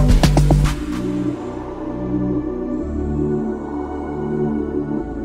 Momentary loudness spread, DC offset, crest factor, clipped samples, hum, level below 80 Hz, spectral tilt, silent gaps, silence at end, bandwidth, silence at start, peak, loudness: 11 LU; under 0.1%; 16 dB; under 0.1%; none; -24 dBFS; -7 dB/octave; none; 0 s; 15 kHz; 0 s; -2 dBFS; -21 LUFS